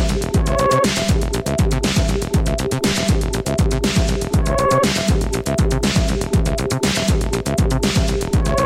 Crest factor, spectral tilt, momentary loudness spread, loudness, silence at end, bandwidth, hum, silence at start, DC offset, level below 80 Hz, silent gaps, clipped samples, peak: 12 dB; -5 dB/octave; 4 LU; -18 LUFS; 0 s; 16.5 kHz; none; 0 s; under 0.1%; -22 dBFS; none; under 0.1%; -6 dBFS